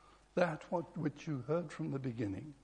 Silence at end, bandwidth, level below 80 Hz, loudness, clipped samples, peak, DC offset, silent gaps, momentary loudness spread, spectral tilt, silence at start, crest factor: 0.1 s; 10 kHz; -68 dBFS; -39 LUFS; under 0.1%; -16 dBFS; under 0.1%; none; 6 LU; -7.5 dB/octave; 0.05 s; 24 dB